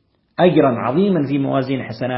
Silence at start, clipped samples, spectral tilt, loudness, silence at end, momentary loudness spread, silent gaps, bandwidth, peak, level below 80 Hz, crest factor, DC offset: 0.4 s; under 0.1%; -12.5 dB/octave; -17 LUFS; 0 s; 9 LU; none; 5.8 kHz; 0 dBFS; -56 dBFS; 18 dB; under 0.1%